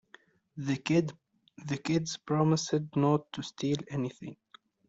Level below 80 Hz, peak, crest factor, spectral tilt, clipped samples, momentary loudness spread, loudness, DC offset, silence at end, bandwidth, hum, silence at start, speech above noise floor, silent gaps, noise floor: -70 dBFS; -14 dBFS; 18 dB; -6 dB/octave; under 0.1%; 15 LU; -31 LUFS; under 0.1%; 0.55 s; 8 kHz; none; 0.55 s; 30 dB; none; -60 dBFS